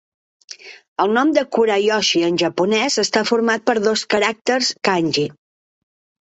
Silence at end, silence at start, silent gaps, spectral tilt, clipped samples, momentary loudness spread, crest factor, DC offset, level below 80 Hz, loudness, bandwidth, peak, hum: 0.9 s; 0.5 s; 0.88-0.96 s; -3.5 dB/octave; under 0.1%; 6 LU; 16 dB; under 0.1%; -64 dBFS; -17 LUFS; 8.2 kHz; -2 dBFS; none